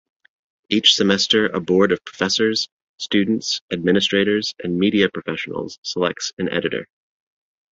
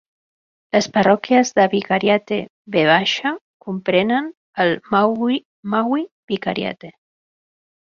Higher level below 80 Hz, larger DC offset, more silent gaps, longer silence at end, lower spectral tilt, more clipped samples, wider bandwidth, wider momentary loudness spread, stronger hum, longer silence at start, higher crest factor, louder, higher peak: about the same, -58 dBFS vs -62 dBFS; neither; second, 2.72-2.96 s, 3.61-3.68 s, 5.78-5.83 s, 6.33-6.37 s vs 2.50-2.65 s, 3.41-3.60 s, 4.37-4.53 s, 5.45-5.63 s, 6.11-6.28 s; second, 0.9 s vs 1.05 s; about the same, -4 dB/octave vs -5 dB/octave; neither; about the same, 8 kHz vs 7.4 kHz; about the same, 11 LU vs 11 LU; neither; about the same, 0.7 s vs 0.75 s; about the same, 20 dB vs 18 dB; about the same, -19 LUFS vs -18 LUFS; about the same, -2 dBFS vs -2 dBFS